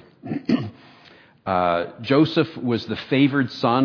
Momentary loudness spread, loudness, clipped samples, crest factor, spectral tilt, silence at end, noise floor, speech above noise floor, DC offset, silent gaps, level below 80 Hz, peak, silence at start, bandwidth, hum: 11 LU; -22 LUFS; under 0.1%; 18 dB; -8 dB/octave; 0 s; -50 dBFS; 30 dB; under 0.1%; none; -60 dBFS; -4 dBFS; 0.25 s; 5.4 kHz; none